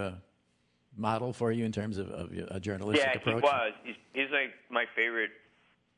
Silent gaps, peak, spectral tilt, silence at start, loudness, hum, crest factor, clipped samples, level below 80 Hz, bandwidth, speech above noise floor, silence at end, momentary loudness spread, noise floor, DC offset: none; -12 dBFS; -5.5 dB/octave; 0 s; -31 LUFS; none; 22 dB; under 0.1%; -70 dBFS; 10.5 kHz; 41 dB; 0.65 s; 12 LU; -73 dBFS; under 0.1%